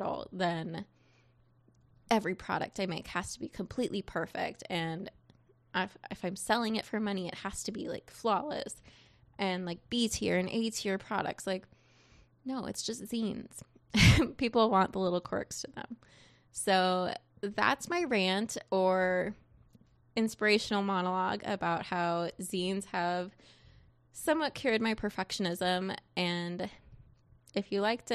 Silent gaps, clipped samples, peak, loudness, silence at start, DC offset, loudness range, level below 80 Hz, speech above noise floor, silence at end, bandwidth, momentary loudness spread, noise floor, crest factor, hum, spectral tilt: none; under 0.1%; -10 dBFS; -33 LUFS; 0 s; under 0.1%; 7 LU; -52 dBFS; 33 dB; 0 s; 14 kHz; 12 LU; -66 dBFS; 22 dB; none; -4.5 dB/octave